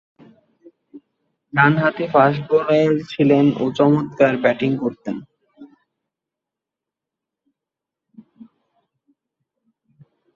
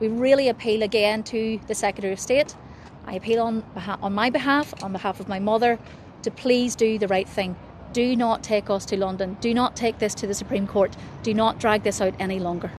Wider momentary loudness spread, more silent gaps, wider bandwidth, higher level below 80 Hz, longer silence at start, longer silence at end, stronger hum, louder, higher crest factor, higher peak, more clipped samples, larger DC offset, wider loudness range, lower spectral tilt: about the same, 9 LU vs 10 LU; neither; second, 7.2 kHz vs 14 kHz; second, -62 dBFS vs -50 dBFS; first, 0.95 s vs 0 s; first, 4.7 s vs 0 s; neither; first, -17 LUFS vs -24 LUFS; about the same, 20 dB vs 18 dB; about the same, -2 dBFS vs -4 dBFS; neither; neither; first, 12 LU vs 1 LU; first, -8 dB/octave vs -4.5 dB/octave